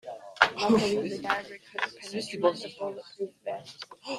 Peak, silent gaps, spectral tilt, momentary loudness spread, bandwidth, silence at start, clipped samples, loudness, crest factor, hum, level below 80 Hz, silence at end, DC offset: 0 dBFS; none; -4 dB/octave; 15 LU; 13.5 kHz; 0.05 s; under 0.1%; -29 LUFS; 30 dB; none; -66 dBFS; 0 s; under 0.1%